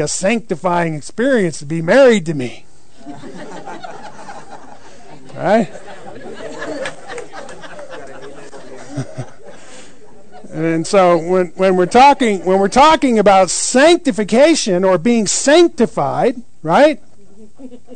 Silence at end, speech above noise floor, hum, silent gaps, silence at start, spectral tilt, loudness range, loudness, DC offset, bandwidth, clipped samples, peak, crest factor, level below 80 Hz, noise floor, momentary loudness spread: 0 s; 32 dB; none; none; 0 s; -4.5 dB/octave; 19 LU; -13 LUFS; 3%; 9.4 kHz; under 0.1%; -2 dBFS; 14 dB; -48 dBFS; -45 dBFS; 24 LU